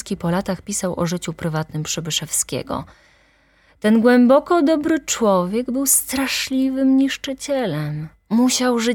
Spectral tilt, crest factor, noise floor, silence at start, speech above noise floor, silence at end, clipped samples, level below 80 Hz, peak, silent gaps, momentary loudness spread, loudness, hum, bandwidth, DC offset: -4 dB/octave; 18 dB; -56 dBFS; 0.05 s; 38 dB; 0 s; under 0.1%; -50 dBFS; -2 dBFS; none; 11 LU; -19 LUFS; none; 18.5 kHz; under 0.1%